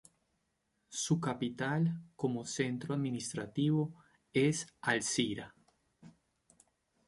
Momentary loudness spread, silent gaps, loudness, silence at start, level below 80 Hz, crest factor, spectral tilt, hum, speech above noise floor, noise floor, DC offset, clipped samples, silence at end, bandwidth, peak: 7 LU; none; -35 LUFS; 0.9 s; -72 dBFS; 22 dB; -5 dB/octave; none; 46 dB; -81 dBFS; under 0.1%; under 0.1%; 1 s; 11.5 kHz; -16 dBFS